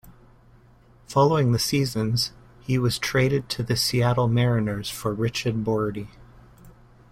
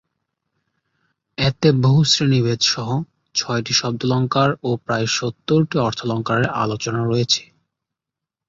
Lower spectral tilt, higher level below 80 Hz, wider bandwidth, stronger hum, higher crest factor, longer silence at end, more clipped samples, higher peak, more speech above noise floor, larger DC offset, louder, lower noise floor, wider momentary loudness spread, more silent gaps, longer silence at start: about the same, -5.5 dB/octave vs -5 dB/octave; about the same, -50 dBFS vs -52 dBFS; first, 16.5 kHz vs 7.8 kHz; neither; about the same, 18 dB vs 18 dB; second, 0.4 s vs 1.05 s; neither; second, -6 dBFS vs -2 dBFS; second, 31 dB vs 67 dB; neither; second, -23 LUFS vs -19 LUFS; second, -54 dBFS vs -85 dBFS; about the same, 8 LU vs 8 LU; neither; second, 0.05 s vs 1.4 s